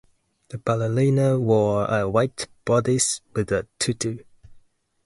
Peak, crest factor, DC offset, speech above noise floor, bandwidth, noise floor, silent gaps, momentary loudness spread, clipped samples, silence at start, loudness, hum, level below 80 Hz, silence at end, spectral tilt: -6 dBFS; 16 dB; under 0.1%; 33 dB; 11.5 kHz; -55 dBFS; none; 10 LU; under 0.1%; 0.5 s; -22 LUFS; none; -52 dBFS; 0.45 s; -5 dB/octave